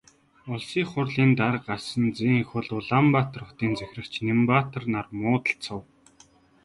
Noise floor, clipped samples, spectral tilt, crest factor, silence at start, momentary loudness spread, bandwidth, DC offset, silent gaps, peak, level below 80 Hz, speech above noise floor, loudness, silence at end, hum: -57 dBFS; under 0.1%; -7 dB/octave; 18 dB; 0.45 s; 11 LU; 11.5 kHz; under 0.1%; none; -6 dBFS; -58 dBFS; 33 dB; -25 LUFS; 0.8 s; none